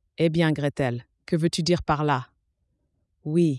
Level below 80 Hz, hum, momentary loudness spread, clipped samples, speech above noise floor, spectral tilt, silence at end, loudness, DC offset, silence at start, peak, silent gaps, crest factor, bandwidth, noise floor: -52 dBFS; none; 6 LU; under 0.1%; 50 dB; -6.5 dB/octave; 0 s; -25 LUFS; under 0.1%; 0.2 s; -8 dBFS; none; 16 dB; 12 kHz; -73 dBFS